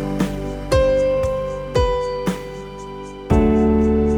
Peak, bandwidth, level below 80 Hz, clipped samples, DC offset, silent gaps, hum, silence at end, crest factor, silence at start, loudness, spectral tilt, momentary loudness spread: -4 dBFS; 18 kHz; -28 dBFS; under 0.1%; under 0.1%; none; none; 0 s; 14 dB; 0 s; -19 LUFS; -7 dB/octave; 17 LU